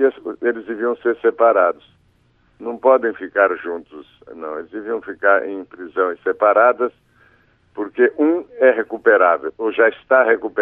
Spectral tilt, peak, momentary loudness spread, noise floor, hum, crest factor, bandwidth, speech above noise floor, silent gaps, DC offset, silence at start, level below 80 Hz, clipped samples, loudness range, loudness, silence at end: -7.5 dB/octave; -2 dBFS; 15 LU; -58 dBFS; none; 16 dB; 3.9 kHz; 40 dB; none; under 0.1%; 0 s; -66 dBFS; under 0.1%; 5 LU; -17 LUFS; 0 s